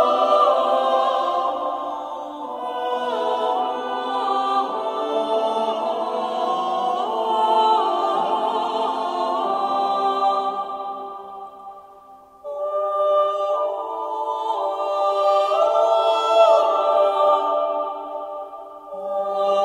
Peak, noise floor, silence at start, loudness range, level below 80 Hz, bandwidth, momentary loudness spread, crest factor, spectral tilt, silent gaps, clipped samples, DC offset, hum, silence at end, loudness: -4 dBFS; -46 dBFS; 0 s; 7 LU; -72 dBFS; 11.5 kHz; 14 LU; 18 dB; -3.5 dB/octave; none; under 0.1%; under 0.1%; none; 0 s; -21 LUFS